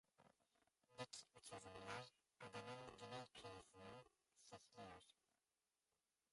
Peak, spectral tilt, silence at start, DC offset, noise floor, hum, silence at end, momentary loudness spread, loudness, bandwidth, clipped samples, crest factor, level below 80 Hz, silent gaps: -40 dBFS; -3.5 dB/octave; 0.2 s; under 0.1%; under -90 dBFS; none; 1.2 s; 10 LU; -59 LUFS; 11.5 kHz; under 0.1%; 22 dB; -84 dBFS; none